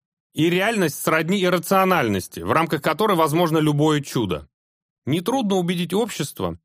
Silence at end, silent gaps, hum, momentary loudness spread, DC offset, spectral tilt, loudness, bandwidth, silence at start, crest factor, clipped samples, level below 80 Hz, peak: 0.1 s; 4.54-5.02 s; none; 8 LU; under 0.1%; -5.5 dB/octave; -21 LUFS; 15.5 kHz; 0.35 s; 18 dB; under 0.1%; -54 dBFS; -2 dBFS